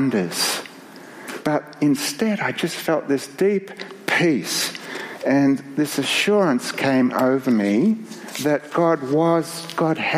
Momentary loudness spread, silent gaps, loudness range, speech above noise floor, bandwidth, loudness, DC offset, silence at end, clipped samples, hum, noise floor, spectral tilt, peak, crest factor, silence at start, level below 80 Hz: 10 LU; none; 3 LU; 21 dB; 15.5 kHz; -21 LUFS; under 0.1%; 0 s; under 0.1%; none; -41 dBFS; -4.5 dB/octave; -4 dBFS; 18 dB; 0 s; -70 dBFS